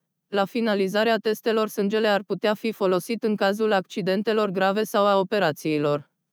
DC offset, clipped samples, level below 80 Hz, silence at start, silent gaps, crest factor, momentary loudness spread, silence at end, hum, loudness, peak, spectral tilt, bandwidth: under 0.1%; under 0.1%; under -90 dBFS; 0.3 s; none; 14 dB; 4 LU; 0.3 s; none; -23 LUFS; -8 dBFS; -5.5 dB/octave; over 20 kHz